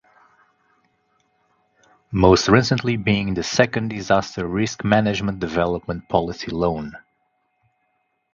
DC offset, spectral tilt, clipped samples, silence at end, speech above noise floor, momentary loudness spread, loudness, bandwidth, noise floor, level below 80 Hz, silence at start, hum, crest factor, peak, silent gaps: under 0.1%; -5.5 dB/octave; under 0.1%; 1.35 s; 50 dB; 10 LU; -20 LUFS; 7.6 kHz; -70 dBFS; -42 dBFS; 2.1 s; none; 22 dB; 0 dBFS; none